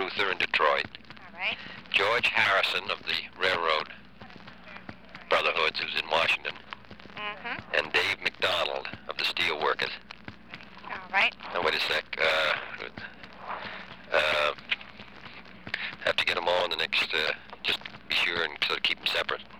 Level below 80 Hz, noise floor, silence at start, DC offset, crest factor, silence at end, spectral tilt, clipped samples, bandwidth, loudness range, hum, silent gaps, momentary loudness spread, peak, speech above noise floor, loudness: -62 dBFS; -49 dBFS; 0 s; 0.2%; 20 dB; 0 s; -2.5 dB/octave; under 0.1%; over 20 kHz; 3 LU; none; none; 20 LU; -10 dBFS; 20 dB; -27 LUFS